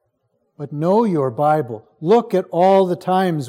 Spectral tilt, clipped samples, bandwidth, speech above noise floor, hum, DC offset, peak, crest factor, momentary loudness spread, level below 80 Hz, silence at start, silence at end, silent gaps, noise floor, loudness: -8 dB/octave; under 0.1%; 15.5 kHz; 51 dB; none; under 0.1%; -4 dBFS; 14 dB; 13 LU; -70 dBFS; 0.6 s; 0 s; none; -68 dBFS; -17 LUFS